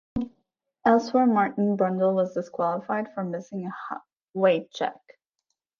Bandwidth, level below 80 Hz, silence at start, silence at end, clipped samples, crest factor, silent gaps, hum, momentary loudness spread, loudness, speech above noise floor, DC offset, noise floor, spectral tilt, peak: 7.2 kHz; -58 dBFS; 0.15 s; 0.85 s; under 0.1%; 20 dB; 4.22-4.33 s; none; 14 LU; -25 LUFS; 56 dB; under 0.1%; -80 dBFS; -7 dB/octave; -6 dBFS